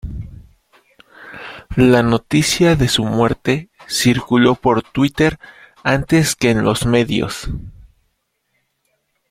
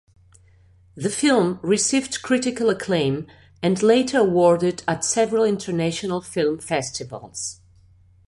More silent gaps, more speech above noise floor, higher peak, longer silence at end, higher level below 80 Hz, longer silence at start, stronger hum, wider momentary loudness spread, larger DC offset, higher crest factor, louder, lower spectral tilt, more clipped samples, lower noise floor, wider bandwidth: neither; first, 53 dB vs 33 dB; first, 0 dBFS vs -4 dBFS; first, 1.6 s vs 0.75 s; first, -36 dBFS vs -56 dBFS; second, 0.05 s vs 0.95 s; neither; first, 18 LU vs 13 LU; neither; about the same, 16 dB vs 18 dB; first, -16 LUFS vs -21 LUFS; about the same, -5 dB/octave vs -4.5 dB/octave; neither; first, -68 dBFS vs -53 dBFS; first, 16 kHz vs 11.5 kHz